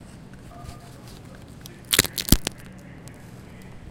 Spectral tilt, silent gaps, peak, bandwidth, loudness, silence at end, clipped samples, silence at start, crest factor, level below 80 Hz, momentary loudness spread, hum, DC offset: -2.5 dB/octave; none; 0 dBFS; 17 kHz; -22 LUFS; 0 s; under 0.1%; 0 s; 28 dB; -38 dBFS; 23 LU; none; under 0.1%